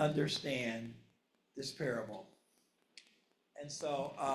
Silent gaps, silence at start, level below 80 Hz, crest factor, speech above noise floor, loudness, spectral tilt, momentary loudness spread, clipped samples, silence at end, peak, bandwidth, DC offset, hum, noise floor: none; 0 s; -76 dBFS; 20 dB; 38 dB; -39 LUFS; -4.5 dB/octave; 24 LU; under 0.1%; 0 s; -20 dBFS; 14 kHz; under 0.1%; none; -76 dBFS